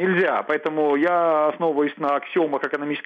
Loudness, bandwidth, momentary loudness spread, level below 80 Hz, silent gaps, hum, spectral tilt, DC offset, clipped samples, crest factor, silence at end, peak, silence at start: -21 LUFS; 6.6 kHz; 5 LU; -72 dBFS; none; none; -8 dB/octave; under 0.1%; under 0.1%; 12 dB; 0.05 s; -8 dBFS; 0 s